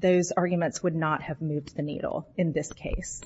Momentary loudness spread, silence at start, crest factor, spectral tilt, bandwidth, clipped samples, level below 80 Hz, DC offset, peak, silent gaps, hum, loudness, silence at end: 9 LU; 0 s; 16 dB; -6 dB/octave; 8 kHz; under 0.1%; -44 dBFS; under 0.1%; -12 dBFS; none; none; -29 LUFS; 0 s